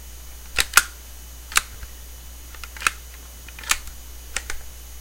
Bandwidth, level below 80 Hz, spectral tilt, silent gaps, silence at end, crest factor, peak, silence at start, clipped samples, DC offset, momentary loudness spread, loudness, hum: 17 kHz; -40 dBFS; 0.5 dB/octave; none; 0 s; 28 dB; 0 dBFS; 0 s; under 0.1%; under 0.1%; 22 LU; -23 LUFS; none